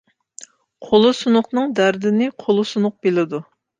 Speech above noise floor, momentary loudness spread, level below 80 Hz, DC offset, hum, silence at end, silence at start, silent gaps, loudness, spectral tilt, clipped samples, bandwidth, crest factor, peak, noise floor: 26 dB; 6 LU; -62 dBFS; under 0.1%; none; 0.35 s; 0.4 s; none; -18 LUFS; -5.5 dB/octave; under 0.1%; 9.4 kHz; 16 dB; -2 dBFS; -44 dBFS